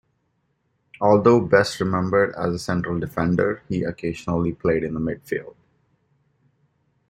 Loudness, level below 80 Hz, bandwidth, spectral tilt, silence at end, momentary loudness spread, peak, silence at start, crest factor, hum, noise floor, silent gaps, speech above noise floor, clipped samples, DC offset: -22 LUFS; -50 dBFS; 16 kHz; -7 dB/octave; 1.6 s; 11 LU; -4 dBFS; 1 s; 20 dB; none; -70 dBFS; none; 49 dB; under 0.1%; under 0.1%